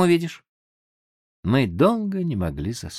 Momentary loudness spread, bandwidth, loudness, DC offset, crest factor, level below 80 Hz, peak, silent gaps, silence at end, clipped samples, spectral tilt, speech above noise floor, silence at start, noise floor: 11 LU; 14.5 kHz; -23 LUFS; under 0.1%; 18 dB; -46 dBFS; -6 dBFS; 0.49-1.43 s; 0 s; under 0.1%; -6.5 dB/octave; over 68 dB; 0 s; under -90 dBFS